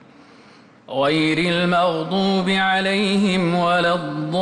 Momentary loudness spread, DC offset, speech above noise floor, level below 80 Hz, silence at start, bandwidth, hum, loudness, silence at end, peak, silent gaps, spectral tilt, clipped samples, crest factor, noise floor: 4 LU; under 0.1%; 29 dB; -58 dBFS; 0.9 s; 11 kHz; none; -19 LUFS; 0 s; -8 dBFS; none; -5.5 dB/octave; under 0.1%; 12 dB; -48 dBFS